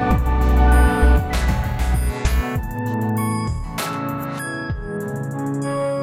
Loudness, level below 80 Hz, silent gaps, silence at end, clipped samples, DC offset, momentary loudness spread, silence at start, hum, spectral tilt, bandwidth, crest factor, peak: -21 LUFS; -20 dBFS; none; 0 s; under 0.1%; under 0.1%; 11 LU; 0 s; none; -6.5 dB/octave; 16 kHz; 16 dB; -2 dBFS